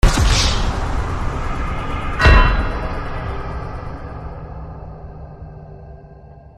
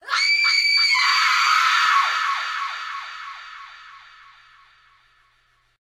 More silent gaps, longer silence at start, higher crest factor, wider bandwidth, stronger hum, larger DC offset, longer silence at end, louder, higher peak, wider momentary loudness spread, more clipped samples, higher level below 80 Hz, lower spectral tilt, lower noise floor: neither; about the same, 0.05 s vs 0.05 s; about the same, 18 dB vs 16 dB; second, 13 kHz vs 16.5 kHz; neither; neither; second, 0.1 s vs 1.85 s; about the same, -19 LUFS vs -17 LUFS; first, 0 dBFS vs -6 dBFS; about the same, 22 LU vs 20 LU; neither; first, -20 dBFS vs -72 dBFS; first, -4.5 dB/octave vs 5 dB/octave; second, -40 dBFS vs -63 dBFS